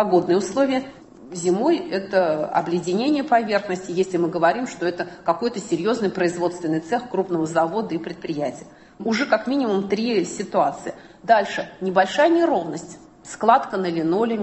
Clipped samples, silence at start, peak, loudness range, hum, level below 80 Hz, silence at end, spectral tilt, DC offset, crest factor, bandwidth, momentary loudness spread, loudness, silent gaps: under 0.1%; 0 s; -2 dBFS; 3 LU; none; -62 dBFS; 0 s; -5.5 dB/octave; under 0.1%; 20 dB; 8.6 kHz; 11 LU; -22 LUFS; none